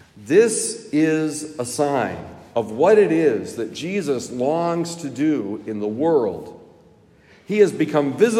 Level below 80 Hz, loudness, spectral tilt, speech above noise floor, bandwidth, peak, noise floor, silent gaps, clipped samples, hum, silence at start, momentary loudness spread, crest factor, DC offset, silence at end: -66 dBFS; -20 LUFS; -5 dB/octave; 32 dB; 14 kHz; -4 dBFS; -52 dBFS; none; under 0.1%; none; 0.15 s; 12 LU; 18 dB; under 0.1%; 0 s